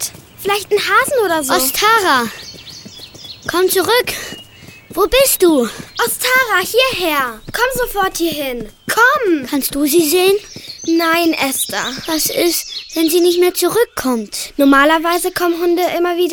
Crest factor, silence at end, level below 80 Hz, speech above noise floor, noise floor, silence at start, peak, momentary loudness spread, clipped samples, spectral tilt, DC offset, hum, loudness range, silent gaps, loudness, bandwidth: 16 dB; 0 s; -42 dBFS; 24 dB; -39 dBFS; 0 s; 0 dBFS; 13 LU; under 0.1%; -2 dB/octave; under 0.1%; none; 2 LU; none; -14 LUFS; 19 kHz